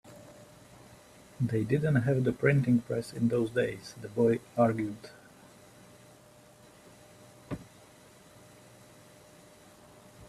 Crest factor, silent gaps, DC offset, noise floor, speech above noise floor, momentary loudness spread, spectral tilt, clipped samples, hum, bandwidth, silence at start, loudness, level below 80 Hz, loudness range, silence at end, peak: 22 dB; none; under 0.1%; -57 dBFS; 28 dB; 18 LU; -8 dB/octave; under 0.1%; none; 14 kHz; 0.05 s; -29 LUFS; -64 dBFS; 22 LU; 0.05 s; -10 dBFS